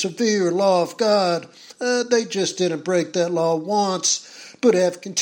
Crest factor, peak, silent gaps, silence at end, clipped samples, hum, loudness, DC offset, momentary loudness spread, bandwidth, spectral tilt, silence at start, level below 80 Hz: 16 dB; -6 dBFS; none; 0 s; under 0.1%; none; -20 LUFS; under 0.1%; 5 LU; 16.5 kHz; -3.5 dB/octave; 0 s; -74 dBFS